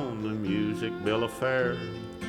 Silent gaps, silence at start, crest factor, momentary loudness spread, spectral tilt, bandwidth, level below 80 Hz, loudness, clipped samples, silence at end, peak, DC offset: none; 0 s; 16 dB; 6 LU; -6.5 dB/octave; 16 kHz; -56 dBFS; -30 LUFS; under 0.1%; 0 s; -14 dBFS; under 0.1%